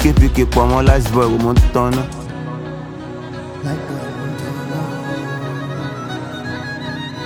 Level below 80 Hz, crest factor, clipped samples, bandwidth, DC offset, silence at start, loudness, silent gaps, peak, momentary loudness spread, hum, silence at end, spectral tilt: -22 dBFS; 16 dB; under 0.1%; 17.5 kHz; under 0.1%; 0 s; -19 LUFS; none; 0 dBFS; 14 LU; none; 0 s; -6.5 dB/octave